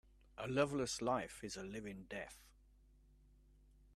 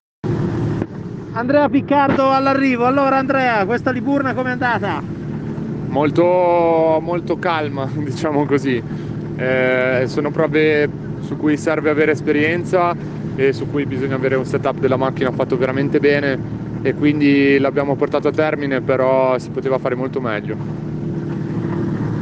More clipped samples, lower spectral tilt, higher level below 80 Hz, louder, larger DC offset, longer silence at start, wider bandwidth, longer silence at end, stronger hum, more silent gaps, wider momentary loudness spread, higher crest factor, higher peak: neither; second, -4.5 dB/octave vs -7.5 dB/octave; second, -66 dBFS vs -46 dBFS; second, -42 LUFS vs -18 LUFS; neither; first, 0.4 s vs 0.25 s; first, 14 kHz vs 8.8 kHz; first, 1.45 s vs 0 s; first, 50 Hz at -65 dBFS vs none; neither; first, 15 LU vs 10 LU; first, 22 dB vs 14 dB; second, -24 dBFS vs -4 dBFS